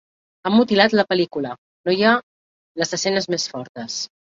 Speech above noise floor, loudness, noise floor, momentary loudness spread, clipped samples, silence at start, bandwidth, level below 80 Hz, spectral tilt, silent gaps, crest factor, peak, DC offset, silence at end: over 71 dB; -20 LUFS; under -90 dBFS; 13 LU; under 0.1%; 0.45 s; 7.8 kHz; -64 dBFS; -4 dB/octave; 1.58-1.84 s, 2.23-2.75 s, 3.69-3.75 s; 20 dB; -2 dBFS; under 0.1%; 0.25 s